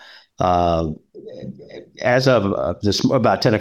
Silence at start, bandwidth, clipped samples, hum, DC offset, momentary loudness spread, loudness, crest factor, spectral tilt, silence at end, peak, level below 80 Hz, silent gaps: 0.4 s; 15.5 kHz; under 0.1%; none; under 0.1%; 20 LU; -18 LUFS; 16 dB; -6 dB/octave; 0 s; -4 dBFS; -48 dBFS; none